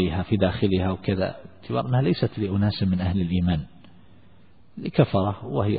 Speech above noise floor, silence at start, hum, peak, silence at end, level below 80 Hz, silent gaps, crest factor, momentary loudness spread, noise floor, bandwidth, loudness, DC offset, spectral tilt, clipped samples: 32 dB; 0 s; none; -6 dBFS; 0 s; -46 dBFS; none; 18 dB; 8 LU; -55 dBFS; 4.9 kHz; -24 LUFS; 0.4%; -12 dB/octave; under 0.1%